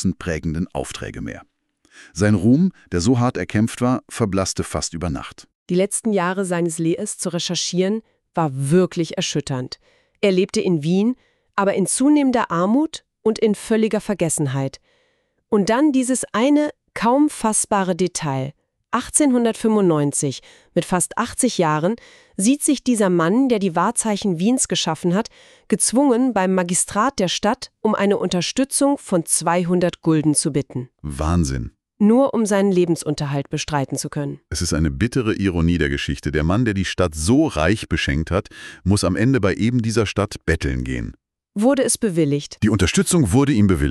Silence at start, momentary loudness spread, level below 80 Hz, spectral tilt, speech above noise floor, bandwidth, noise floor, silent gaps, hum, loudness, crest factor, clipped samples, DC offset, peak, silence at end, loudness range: 0 s; 10 LU; -38 dBFS; -5 dB/octave; 47 dB; 13.5 kHz; -66 dBFS; 5.55-5.66 s; none; -19 LUFS; 16 dB; under 0.1%; under 0.1%; -2 dBFS; 0 s; 3 LU